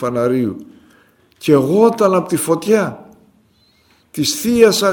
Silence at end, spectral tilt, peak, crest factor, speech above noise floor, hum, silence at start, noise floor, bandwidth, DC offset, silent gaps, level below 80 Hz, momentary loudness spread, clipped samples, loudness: 0 s; -4.5 dB/octave; 0 dBFS; 16 dB; 41 dB; none; 0 s; -55 dBFS; 18 kHz; under 0.1%; none; -54 dBFS; 12 LU; under 0.1%; -15 LUFS